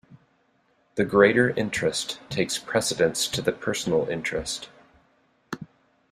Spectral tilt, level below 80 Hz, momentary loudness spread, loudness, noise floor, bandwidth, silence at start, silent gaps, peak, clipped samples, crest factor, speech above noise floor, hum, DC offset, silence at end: -3.5 dB/octave; -56 dBFS; 18 LU; -24 LUFS; -66 dBFS; 15.5 kHz; 0.1 s; none; -4 dBFS; under 0.1%; 22 dB; 42 dB; none; under 0.1%; 0.45 s